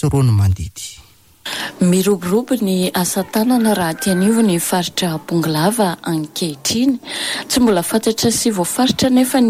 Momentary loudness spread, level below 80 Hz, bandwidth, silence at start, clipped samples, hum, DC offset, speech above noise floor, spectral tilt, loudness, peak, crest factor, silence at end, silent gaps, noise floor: 8 LU; -42 dBFS; 16 kHz; 0 s; under 0.1%; none; under 0.1%; 30 dB; -5 dB/octave; -16 LUFS; -4 dBFS; 12 dB; 0 s; none; -46 dBFS